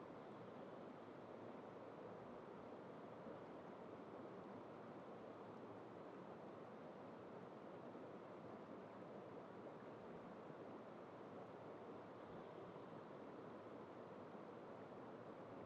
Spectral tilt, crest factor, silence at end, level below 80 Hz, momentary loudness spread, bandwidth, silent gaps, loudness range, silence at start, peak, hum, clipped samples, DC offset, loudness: -6 dB/octave; 12 dB; 0 s; -90 dBFS; 1 LU; 7.6 kHz; none; 0 LU; 0 s; -44 dBFS; none; under 0.1%; under 0.1%; -57 LUFS